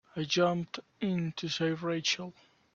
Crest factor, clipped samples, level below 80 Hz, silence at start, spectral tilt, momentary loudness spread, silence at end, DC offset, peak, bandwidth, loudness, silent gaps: 18 dB; under 0.1%; -72 dBFS; 0.15 s; -4.5 dB/octave; 8 LU; 0.45 s; under 0.1%; -14 dBFS; 7.6 kHz; -32 LUFS; none